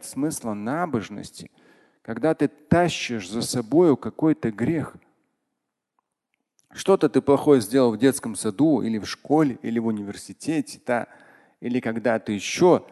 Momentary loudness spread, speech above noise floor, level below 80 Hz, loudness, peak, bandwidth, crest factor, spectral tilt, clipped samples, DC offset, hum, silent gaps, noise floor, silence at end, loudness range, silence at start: 13 LU; 59 dB; -56 dBFS; -23 LUFS; -4 dBFS; 12.5 kHz; 18 dB; -5.5 dB/octave; under 0.1%; under 0.1%; none; none; -81 dBFS; 0.1 s; 5 LU; 0 s